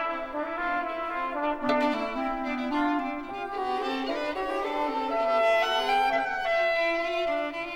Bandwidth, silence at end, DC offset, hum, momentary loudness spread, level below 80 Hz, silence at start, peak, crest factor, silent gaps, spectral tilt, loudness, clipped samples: 17 kHz; 0 s; under 0.1%; none; 7 LU; -54 dBFS; 0 s; -14 dBFS; 14 dB; none; -3.5 dB/octave; -28 LUFS; under 0.1%